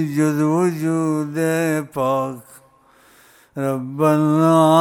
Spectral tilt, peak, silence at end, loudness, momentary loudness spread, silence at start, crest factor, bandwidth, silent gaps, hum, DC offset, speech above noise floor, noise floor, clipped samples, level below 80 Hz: -7 dB/octave; -2 dBFS; 0 s; -19 LUFS; 10 LU; 0 s; 18 dB; 16.5 kHz; none; none; under 0.1%; 35 dB; -53 dBFS; under 0.1%; -64 dBFS